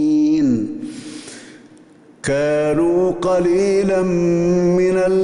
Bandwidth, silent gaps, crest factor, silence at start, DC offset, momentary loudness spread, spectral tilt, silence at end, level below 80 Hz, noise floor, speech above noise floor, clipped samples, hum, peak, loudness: 11 kHz; none; 10 dB; 0 s; under 0.1%; 16 LU; -7 dB/octave; 0 s; -46 dBFS; -46 dBFS; 30 dB; under 0.1%; none; -8 dBFS; -17 LUFS